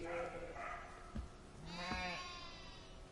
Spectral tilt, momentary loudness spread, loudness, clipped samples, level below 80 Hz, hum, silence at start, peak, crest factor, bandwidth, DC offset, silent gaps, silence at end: -4 dB/octave; 13 LU; -47 LUFS; under 0.1%; -56 dBFS; none; 0 s; -30 dBFS; 18 dB; 11.5 kHz; under 0.1%; none; 0 s